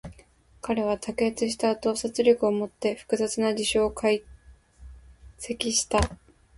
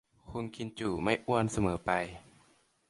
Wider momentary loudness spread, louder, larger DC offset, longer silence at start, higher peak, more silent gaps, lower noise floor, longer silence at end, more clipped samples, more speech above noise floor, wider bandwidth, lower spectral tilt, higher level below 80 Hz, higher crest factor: second, 8 LU vs 12 LU; first, -26 LUFS vs -33 LUFS; neither; second, 0.05 s vs 0.25 s; first, -8 dBFS vs -12 dBFS; neither; second, -56 dBFS vs -67 dBFS; second, 0.45 s vs 0.7 s; neither; second, 31 dB vs 35 dB; about the same, 11.5 kHz vs 11.5 kHz; second, -3.5 dB/octave vs -5.5 dB/octave; first, -44 dBFS vs -54 dBFS; about the same, 20 dB vs 22 dB